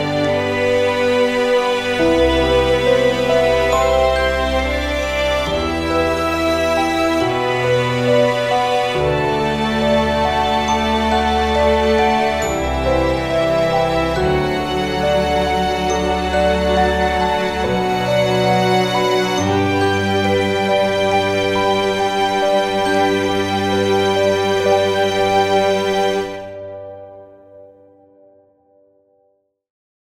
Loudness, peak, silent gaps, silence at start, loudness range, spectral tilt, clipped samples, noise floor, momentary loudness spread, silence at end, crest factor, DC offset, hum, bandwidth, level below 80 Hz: -16 LUFS; -4 dBFS; none; 0 s; 2 LU; -5 dB/octave; under 0.1%; -62 dBFS; 4 LU; 2.35 s; 14 dB; under 0.1%; none; 16 kHz; -32 dBFS